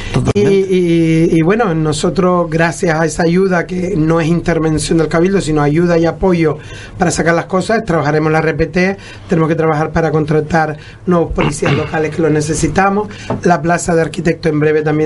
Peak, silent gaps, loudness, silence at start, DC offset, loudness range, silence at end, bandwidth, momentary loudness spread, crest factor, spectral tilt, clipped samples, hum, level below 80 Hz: 0 dBFS; none; -13 LUFS; 0 s; under 0.1%; 2 LU; 0 s; 11.5 kHz; 4 LU; 12 dB; -6 dB/octave; under 0.1%; none; -32 dBFS